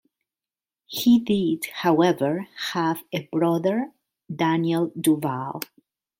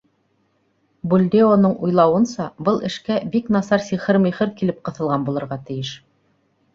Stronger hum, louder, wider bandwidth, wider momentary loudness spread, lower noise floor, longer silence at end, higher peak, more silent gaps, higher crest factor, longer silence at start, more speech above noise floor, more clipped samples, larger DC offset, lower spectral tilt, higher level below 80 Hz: neither; second, -23 LUFS vs -19 LUFS; first, 16.5 kHz vs 7.6 kHz; about the same, 13 LU vs 13 LU; first, under -90 dBFS vs -65 dBFS; second, 0.55 s vs 0.8 s; second, -6 dBFS vs -2 dBFS; neither; about the same, 18 dB vs 18 dB; second, 0.9 s vs 1.05 s; first, over 67 dB vs 46 dB; neither; neither; second, -5.5 dB/octave vs -7 dB/octave; second, -66 dBFS vs -58 dBFS